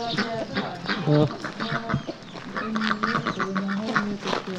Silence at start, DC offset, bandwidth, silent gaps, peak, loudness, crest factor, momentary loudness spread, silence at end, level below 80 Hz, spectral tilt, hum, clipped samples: 0 s; under 0.1%; 9 kHz; none; -6 dBFS; -26 LUFS; 20 dB; 9 LU; 0 s; -54 dBFS; -6 dB/octave; none; under 0.1%